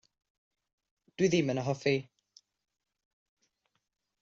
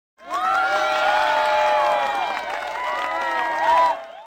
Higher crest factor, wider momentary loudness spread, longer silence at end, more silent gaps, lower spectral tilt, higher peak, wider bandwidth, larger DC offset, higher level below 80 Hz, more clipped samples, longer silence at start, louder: first, 20 dB vs 12 dB; second, 4 LU vs 8 LU; first, 2.2 s vs 0 s; neither; first, -5.5 dB/octave vs -1.5 dB/octave; second, -16 dBFS vs -8 dBFS; second, 7.8 kHz vs 17 kHz; neither; second, -72 dBFS vs -60 dBFS; neither; first, 1.2 s vs 0.2 s; second, -30 LUFS vs -20 LUFS